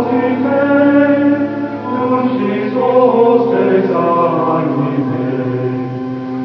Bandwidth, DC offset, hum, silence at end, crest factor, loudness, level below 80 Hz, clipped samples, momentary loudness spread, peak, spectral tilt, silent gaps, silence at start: 5.8 kHz; under 0.1%; none; 0 s; 12 dB; -14 LUFS; -60 dBFS; under 0.1%; 9 LU; 0 dBFS; -9.5 dB/octave; none; 0 s